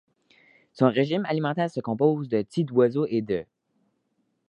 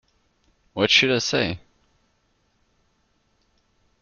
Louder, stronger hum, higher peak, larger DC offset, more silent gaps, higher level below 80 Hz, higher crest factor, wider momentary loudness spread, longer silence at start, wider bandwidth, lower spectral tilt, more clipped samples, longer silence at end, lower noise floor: second, -25 LUFS vs -19 LUFS; neither; second, -4 dBFS vs 0 dBFS; neither; neither; second, -66 dBFS vs -58 dBFS; about the same, 22 dB vs 26 dB; second, 6 LU vs 20 LU; about the same, 0.75 s vs 0.75 s; first, 10.5 kHz vs 7.4 kHz; first, -8 dB/octave vs -3 dB/octave; neither; second, 1.05 s vs 2.45 s; first, -73 dBFS vs -67 dBFS